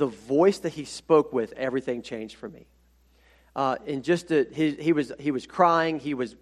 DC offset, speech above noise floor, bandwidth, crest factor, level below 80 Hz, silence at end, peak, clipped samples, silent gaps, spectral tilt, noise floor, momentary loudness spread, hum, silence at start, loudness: under 0.1%; 35 dB; 12.5 kHz; 20 dB; -62 dBFS; 0.1 s; -6 dBFS; under 0.1%; none; -6 dB/octave; -61 dBFS; 15 LU; none; 0 s; -25 LUFS